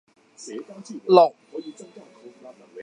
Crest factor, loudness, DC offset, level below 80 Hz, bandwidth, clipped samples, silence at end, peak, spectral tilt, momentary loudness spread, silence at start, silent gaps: 24 dB; -18 LUFS; under 0.1%; -84 dBFS; 9.8 kHz; under 0.1%; 0 s; -2 dBFS; -5.5 dB/octave; 26 LU; 0.45 s; none